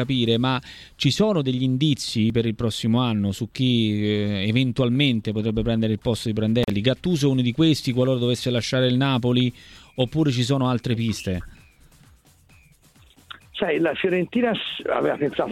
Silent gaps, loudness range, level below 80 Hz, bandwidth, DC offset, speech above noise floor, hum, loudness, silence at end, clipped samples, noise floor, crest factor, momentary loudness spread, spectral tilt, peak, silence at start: none; 6 LU; -48 dBFS; 14.5 kHz; under 0.1%; 32 dB; none; -22 LUFS; 0 s; under 0.1%; -54 dBFS; 16 dB; 5 LU; -6 dB/octave; -6 dBFS; 0 s